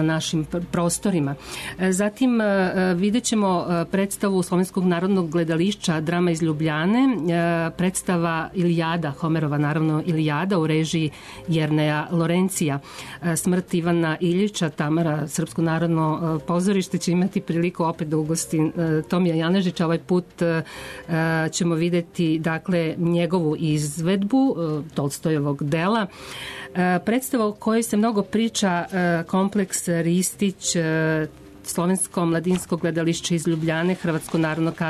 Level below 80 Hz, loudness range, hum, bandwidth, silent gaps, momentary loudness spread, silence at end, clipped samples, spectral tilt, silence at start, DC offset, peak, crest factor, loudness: -54 dBFS; 2 LU; none; 13.5 kHz; none; 5 LU; 0 s; under 0.1%; -5.5 dB/octave; 0 s; under 0.1%; -12 dBFS; 10 dB; -22 LUFS